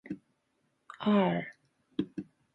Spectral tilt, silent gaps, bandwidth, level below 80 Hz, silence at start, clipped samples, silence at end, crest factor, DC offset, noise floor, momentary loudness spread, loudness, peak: -8.5 dB/octave; none; 4.3 kHz; -72 dBFS; 0.05 s; under 0.1%; 0.3 s; 20 dB; under 0.1%; -77 dBFS; 18 LU; -32 LUFS; -16 dBFS